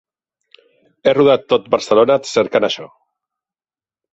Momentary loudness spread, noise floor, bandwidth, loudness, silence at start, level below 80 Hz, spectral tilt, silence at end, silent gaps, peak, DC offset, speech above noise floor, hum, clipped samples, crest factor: 7 LU; under -90 dBFS; 8.2 kHz; -15 LUFS; 1.05 s; -60 dBFS; -4.5 dB/octave; 1.25 s; none; 0 dBFS; under 0.1%; over 76 dB; none; under 0.1%; 16 dB